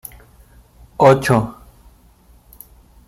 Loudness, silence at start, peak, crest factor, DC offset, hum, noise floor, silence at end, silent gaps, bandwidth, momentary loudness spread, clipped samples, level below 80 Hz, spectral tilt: -15 LUFS; 1 s; 0 dBFS; 20 dB; under 0.1%; none; -50 dBFS; 1.55 s; none; 16 kHz; 25 LU; under 0.1%; -46 dBFS; -6.5 dB/octave